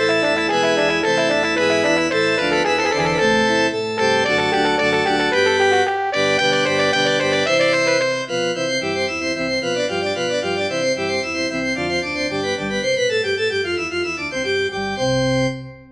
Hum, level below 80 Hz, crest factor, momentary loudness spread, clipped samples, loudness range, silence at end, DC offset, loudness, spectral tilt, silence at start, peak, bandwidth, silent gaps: none; -48 dBFS; 14 dB; 5 LU; under 0.1%; 4 LU; 0.05 s; under 0.1%; -18 LUFS; -3.5 dB/octave; 0 s; -4 dBFS; 11 kHz; none